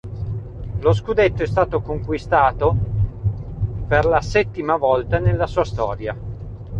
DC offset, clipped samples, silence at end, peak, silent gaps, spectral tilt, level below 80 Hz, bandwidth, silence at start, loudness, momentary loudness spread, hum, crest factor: under 0.1%; under 0.1%; 0 s; -2 dBFS; none; -7.5 dB/octave; -32 dBFS; 8 kHz; 0.05 s; -20 LUFS; 12 LU; none; 16 dB